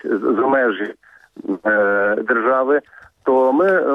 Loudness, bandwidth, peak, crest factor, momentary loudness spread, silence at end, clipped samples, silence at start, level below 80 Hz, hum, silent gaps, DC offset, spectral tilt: -17 LUFS; 5.4 kHz; -6 dBFS; 12 dB; 11 LU; 0 s; under 0.1%; 0.05 s; -64 dBFS; none; none; under 0.1%; -7.5 dB/octave